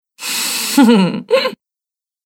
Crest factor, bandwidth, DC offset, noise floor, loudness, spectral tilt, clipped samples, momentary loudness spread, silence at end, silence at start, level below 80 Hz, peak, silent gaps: 14 dB; 18.5 kHz; under 0.1%; -88 dBFS; -14 LUFS; -4 dB/octave; under 0.1%; 9 LU; 0.7 s; 0.2 s; -64 dBFS; 0 dBFS; none